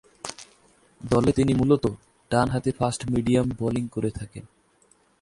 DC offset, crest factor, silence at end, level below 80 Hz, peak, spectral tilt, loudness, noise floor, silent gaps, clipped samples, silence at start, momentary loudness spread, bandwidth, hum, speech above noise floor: under 0.1%; 18 dB; 0.8 s; -46 dBFS; -6 dBFS; -6.5 dB/octave; -24 LUFS; -62 dBFS; none; under 0.1%; 0.25 s; 19 LU; 11.5 kHz; none; 38 dB